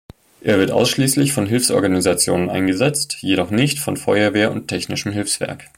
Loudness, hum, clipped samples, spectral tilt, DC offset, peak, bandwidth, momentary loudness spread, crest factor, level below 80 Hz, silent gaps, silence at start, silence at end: -18 LUFS; none; under 0.1%; -4 dB/octave; under 0.1%; -2 dBFS; 16.5 kHz; 6 LU; 16 dB; -50 dBFS; none; 0.45 s; 0.1 s